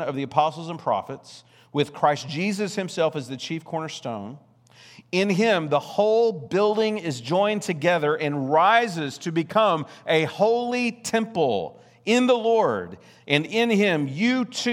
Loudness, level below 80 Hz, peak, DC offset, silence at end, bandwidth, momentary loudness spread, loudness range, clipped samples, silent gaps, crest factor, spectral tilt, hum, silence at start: -23 LUFS; -74 dBFS; -2 dBFS; under 0.1%; 0 s; 14.5 kHz; 11 LU; 5 LU; under 0.1%; none; 22 dB; -5 dB/octave; none; 0 s